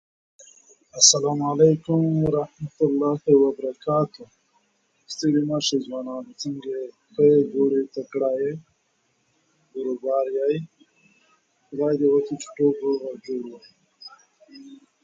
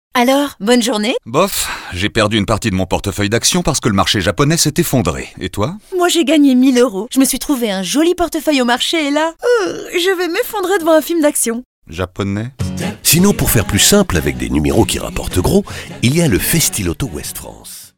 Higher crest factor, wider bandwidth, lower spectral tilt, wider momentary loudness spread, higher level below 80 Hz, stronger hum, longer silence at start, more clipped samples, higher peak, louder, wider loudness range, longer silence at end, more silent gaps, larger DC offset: first, 22 dB vs 14 dB; second, 9.2 kHz vs 18 kHz; about the same, -4.5 dB/octave vs -4 dB/octave; first, 16 LU vs 10 LU; second, -62 dBFS vs -32 dBFS; neither; first, 0.95 s vs 0.15 s; neither; about the same, -2 dBFS vs 0 dBFS; second, -22 LUFS vs -14 LUFS; first, 8 LU vs 2 LU; first, 0.3 s vs 0.1 s; second, none vs 11.65-11.82 s; neither